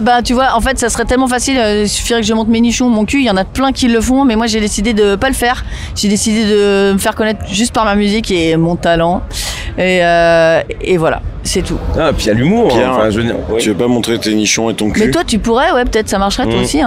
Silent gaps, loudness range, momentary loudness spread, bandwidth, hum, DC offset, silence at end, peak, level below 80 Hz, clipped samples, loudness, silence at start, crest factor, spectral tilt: none; 1 LU; 5 LU; 16 kHz; none; 0.3%; 0 s; 0 dBFS; -26 dBFS; under 0.1%; -12 LUFS; 0 s; 12 dB; -4.5 dB/octave